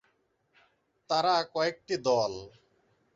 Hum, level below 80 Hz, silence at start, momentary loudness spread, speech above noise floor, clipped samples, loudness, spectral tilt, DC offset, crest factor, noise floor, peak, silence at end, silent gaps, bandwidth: none; -68 dBFS; 1.1 s; 7 LU; 44 dB; under 0.1%; -29 LUFS; -4 dB/octave; under 0.1%; 18 dB; -73 dBFS; -14 dBFS; 0.65 s; none; 7.8 kHz